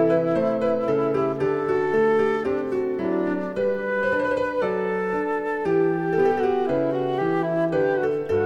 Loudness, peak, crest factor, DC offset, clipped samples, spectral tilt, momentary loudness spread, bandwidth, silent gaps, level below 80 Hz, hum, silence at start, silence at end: -23 LUFS; -8 dBFS; 14 dB; under 0.1%; under 0.1%; -8 dB/octave; 4 LU; 8 kHz; none; -56 dBFS; none; 0 s; 0 s